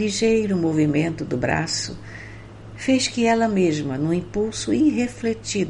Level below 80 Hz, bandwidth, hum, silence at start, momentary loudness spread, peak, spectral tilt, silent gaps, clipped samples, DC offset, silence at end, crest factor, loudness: -46 dBFS; 11 kHz; none; 0 s; 16 LU; -6 dBFS; -5 dB/octave; none; under 0.1%; under 0.1%; 0 s; 16 dB; -22 LUFS